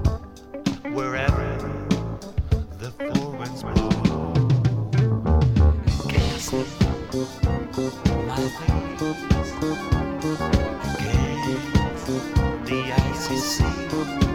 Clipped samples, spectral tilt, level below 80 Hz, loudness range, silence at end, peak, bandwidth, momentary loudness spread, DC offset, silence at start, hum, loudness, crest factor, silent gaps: under 0.1%; -6 dB/octave; -30 dBFS; 4 LU; 0 s; -2 dBFS; 16.5 kHz; 8 LU; under 0.1%; 0 s; none; -24 LUFS; 20 dB; none